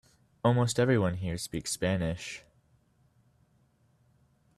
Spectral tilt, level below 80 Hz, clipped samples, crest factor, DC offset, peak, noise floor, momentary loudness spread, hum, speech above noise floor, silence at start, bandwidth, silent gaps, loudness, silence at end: -5.5 dB/octave; -58 dBFS; under 0.1%; 20 dB; under 0.1%; -12 dBFS; -68 dBFS; 12 LU; none; 39 dB; 0.45 s; 13.5 kHz; none; -30 LUFS; 2.2 s